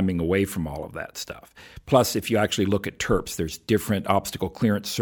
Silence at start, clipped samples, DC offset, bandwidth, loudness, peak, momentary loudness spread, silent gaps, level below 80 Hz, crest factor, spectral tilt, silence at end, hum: 0 s; under 0.1%; under 0.1%; 19 kHz; -25 LUFS; -4 dBFS; 13 LU; none; -46 dBFS; 20 dB; -5 dB/octave; 0 s; none